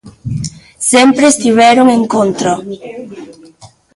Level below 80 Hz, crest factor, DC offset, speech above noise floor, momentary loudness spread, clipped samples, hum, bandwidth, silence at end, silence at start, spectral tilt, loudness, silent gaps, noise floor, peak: -44 dBFS; 12 dB; under 0.1%; 31 dB; 19 LU; under 0.1%; none; 11.5 kHz; 0.3 s; 0.05 s; -4 dB/octave; -10 LUFS; none; -41 dBFS; 0 dBFS